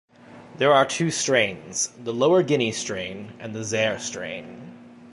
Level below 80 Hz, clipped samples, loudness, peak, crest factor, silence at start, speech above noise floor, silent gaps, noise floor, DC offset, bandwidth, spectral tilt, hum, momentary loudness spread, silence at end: -62 dBFS; under 0.1%; -23 LUFS; -4 dBFS; 20 dB; 0.3 s; 22 dB; none; -46 dBFS; under 0.1%; 11.5 kHz; -3.5 dB/octave; none; 17 LU; 0 s